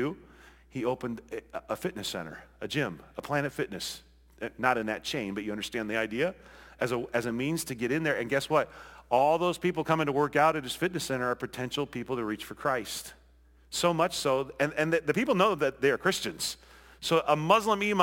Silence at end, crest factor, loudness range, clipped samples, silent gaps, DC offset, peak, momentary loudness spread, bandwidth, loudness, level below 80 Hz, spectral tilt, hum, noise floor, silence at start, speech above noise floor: 0 s; 22 dB; 6 LU; under 0.1%; none; under 0.1%; -8 dBFS; 13 LU; 17 kHz; -29 LUFS; -60 dBFS; -4.5 dB/octave; none; -59 dBFS; 0 s; 30 dB